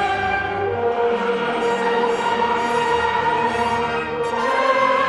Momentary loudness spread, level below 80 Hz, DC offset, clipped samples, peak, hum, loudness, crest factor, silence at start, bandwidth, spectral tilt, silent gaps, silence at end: 3 LU; -48 dBFS; under 0.1%; under 0.1%; -6 dBFS; none; -20 LUFS; 14 dB; 0 s; 11 kHz; -4.5 dB/octave; none; 0 s